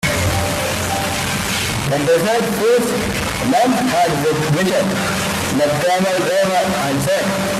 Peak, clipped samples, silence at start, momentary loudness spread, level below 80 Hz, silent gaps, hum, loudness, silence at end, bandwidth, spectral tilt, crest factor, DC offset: -4 dBFS; under 0.1%; 0 s; 4 LU; -40 dBFS; none; none; -16 LUFS; 0 s; 16 kHz; -4 dB/octave; 12 dB; under 0.1%